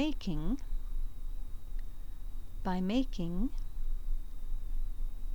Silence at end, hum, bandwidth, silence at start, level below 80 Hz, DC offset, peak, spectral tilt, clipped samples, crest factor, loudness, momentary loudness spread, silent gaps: 0 s; none; 6.6 kHz; 0 s; -34 dBFS; 1%; -20 dBFS; -7 dB/octave; under 0.1%; 14 dB; -40 LUFS; 15 LU; none